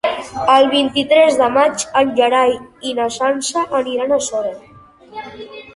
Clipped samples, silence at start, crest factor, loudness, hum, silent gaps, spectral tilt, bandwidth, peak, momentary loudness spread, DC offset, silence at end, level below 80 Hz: under 0.1%; 0.05 s; 14 dB; -15 LUFS; none; none; -2.5 dB/octave; 11.5 kHz; -2 dBFS; 19 LU; under 0.1%; 0.05 s; -54 dBFS